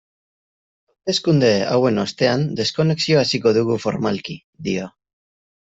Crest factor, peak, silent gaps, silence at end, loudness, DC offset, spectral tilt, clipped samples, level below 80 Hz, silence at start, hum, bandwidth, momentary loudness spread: 16 dB; -4 dBFS; 4.44-4.53 s; 0.9 s; -19 LUFS; under 0.1%; -5.5 dB/octave; under 0.1%; -58 dBFS; 1.05 s; none; 8 kHz; 11 LU